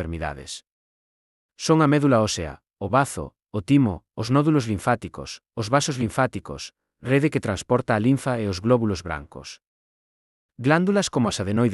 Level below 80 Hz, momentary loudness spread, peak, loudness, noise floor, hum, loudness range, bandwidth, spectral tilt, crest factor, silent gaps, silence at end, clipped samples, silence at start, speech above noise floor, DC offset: -50 dBFS; 16 LU; -6 dBFS; -23 LUFS; under -90 dBFS; none; 3 LU; 12 kHz; -6 dB/octave; 18 dB; 0.72-1.49 s, 9.67-10.49 s; 0 s; under 0.1%; 0 s; over 68 dB; under 0.1%